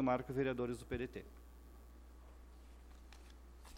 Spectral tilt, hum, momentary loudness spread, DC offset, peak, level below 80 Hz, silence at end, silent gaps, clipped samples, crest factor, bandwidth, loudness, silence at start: -7 dB/octave; none; 22 LU; under 0.1%; -24 dBFS; -58 dBFS; 0 s; none; under 0.1%; 20 dB; 16.5 kHz; -41 LUFS; 0 s